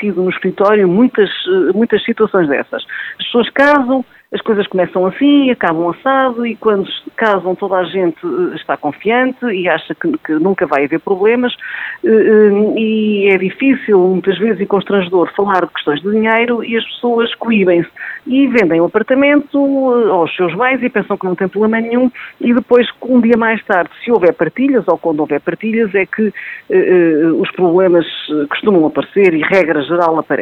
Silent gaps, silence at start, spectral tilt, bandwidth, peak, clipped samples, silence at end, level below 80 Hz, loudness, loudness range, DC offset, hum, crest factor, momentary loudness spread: none; 0 s; -8 dB/octave; 6 kHz; 0 dBFS; under 0.1%; 0 s; -56 dBFS; -13 LUFS; 3 LU; under 0.1%; none; 12 dB; 7 LU